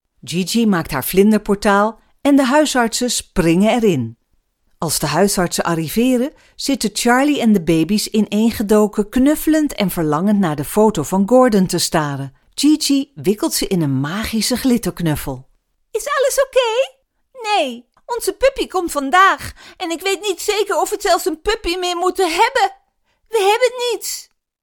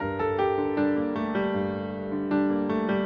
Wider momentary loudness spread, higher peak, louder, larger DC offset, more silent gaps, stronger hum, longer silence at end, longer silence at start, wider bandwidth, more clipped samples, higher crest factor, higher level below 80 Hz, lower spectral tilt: first, 10 LU vs 5 LU; first, 0 dBFS vs -14 dBFS; first, -16 LUFS vs -27 LUFS; neither; neither; neither; first, 0.4 s vs 0 s; first, 0.25 s vs 0 s; first, 18.5 kHz vs 5.2 kHz; neither; about the same, 16 dB vs 12 dB; first, -40 dBFS vs -58 dBFS; second, -4.5 dB/octave vs -9.5 dB/octave